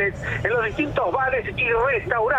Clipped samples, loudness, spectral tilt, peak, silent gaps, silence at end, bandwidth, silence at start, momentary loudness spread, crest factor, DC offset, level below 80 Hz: under 0.1%; -22 LUFS; -6.5 dB/octave; -6 dBFS; none; 0 s; 8.8 kHz; 0 s; 3 LU; 16 dB; under 0.1%; -42 dBFS